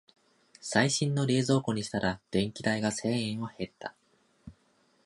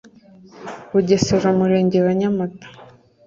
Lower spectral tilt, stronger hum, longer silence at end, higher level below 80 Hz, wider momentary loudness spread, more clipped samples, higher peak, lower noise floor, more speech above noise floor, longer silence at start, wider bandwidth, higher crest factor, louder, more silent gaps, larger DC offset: second, -5 dB/octave vs -6.5 dB/octave; neither; about the same, 0.55 s vs 0.45 s; second, -60 dBFS vs -50 dBFS; second, 13 LU vs 18 LU; neither; second, -10 dBFS vs -2 dBFS; first, -69 dBFS vs -46 dBFS; first, 39 dB vs 29 dB; about the same, 0.65 s vs 0.55 s; first, 11.5 kHz vs 7.6 kHz; about the same, 22 dB vs 18 dB; second, -30 LUFS vs -18 LUFS; neither; neither